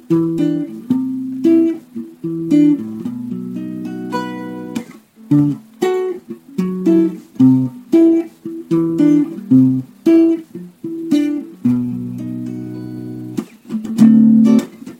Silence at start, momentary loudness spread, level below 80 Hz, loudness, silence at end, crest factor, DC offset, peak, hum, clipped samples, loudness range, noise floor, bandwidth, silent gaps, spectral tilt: 0.1 s; 15 LU; -58 dBFS; -16 LUFS; 0.1 s; 14 dB; under 0.1%; 0 dBFS; none; under 0.1%; 7 LU; -38 dBFS; 13.5 kHz; none; -8.5 dB/octave